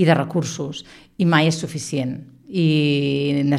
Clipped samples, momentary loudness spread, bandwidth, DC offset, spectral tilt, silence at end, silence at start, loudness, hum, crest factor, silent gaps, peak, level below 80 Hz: under 0.1%; 13 LU; 12 kHz; under 0.1%; -6 dB/octave; 0 s; 0 s; -20 LUFS; none; 18 dB; none; -2 dBFS; -58 dBFS